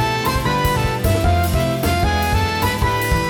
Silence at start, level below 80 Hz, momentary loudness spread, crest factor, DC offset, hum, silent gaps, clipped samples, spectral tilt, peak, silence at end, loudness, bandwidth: 0 s; -26 dBFS; 2 LU; 12 dB; under 0.1%; none; none; under 0.1%; -5 dB/octave; -4 dBFS; 0 s; -18 LUFS; 19.5 kHz